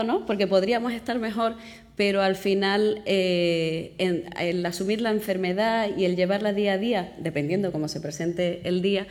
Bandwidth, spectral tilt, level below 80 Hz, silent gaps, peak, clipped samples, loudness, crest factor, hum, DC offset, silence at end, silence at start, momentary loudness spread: 18.5 kHz; -5.5 dB/octave; -58 dBFS; none; -10 dBFS; under 0.1%; -25 LUFS; 16 dB; none; under 0.1%; 0 s; 0 s; 6 LU